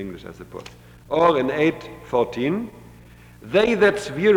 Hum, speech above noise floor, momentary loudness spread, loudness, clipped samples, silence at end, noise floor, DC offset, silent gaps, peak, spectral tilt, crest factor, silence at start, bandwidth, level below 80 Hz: none; 25 dB; 20 LU; -21 LUFS; under 0.1%; 0 s; -46 dBFS; under 0.1%; none; -6 dBFS; -6 dB/octave; 16 dB; 0 s; 15.5 kHz; -50 dBFS